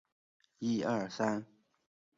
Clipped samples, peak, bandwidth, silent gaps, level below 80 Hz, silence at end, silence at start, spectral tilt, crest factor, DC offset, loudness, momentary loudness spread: under 0.1%; -18 dBFS; 7.6 kHz; none; -76 dBFS; 0.75 s; 0.6 s; -5 dB/octave; 20 dB; under 0.1%; -35 LUFS; 7 LU